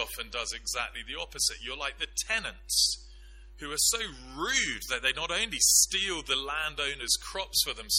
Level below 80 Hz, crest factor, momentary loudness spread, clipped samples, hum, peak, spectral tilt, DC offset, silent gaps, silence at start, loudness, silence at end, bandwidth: -50 dBFS; 22 dB; 12 LU; under 0.1%; none; -10 dBFS; 0.5 dB/octave; under 0.1%; none; 0 s; -28 LUFS; 0 s; 16.5 kHz